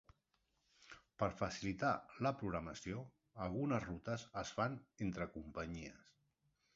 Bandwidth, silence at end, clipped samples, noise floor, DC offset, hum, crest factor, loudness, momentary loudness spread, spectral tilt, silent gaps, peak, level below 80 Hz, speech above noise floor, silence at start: 7.6 kHz; 0.8 s; under 0.1%; -83 dBFS; under 0.1%; none; 22 dB; -43 LUFS; 11 LU; -5.5 dB/octave; none; -22 dBFS; -64 dBFS; 40 dB; 0.8 s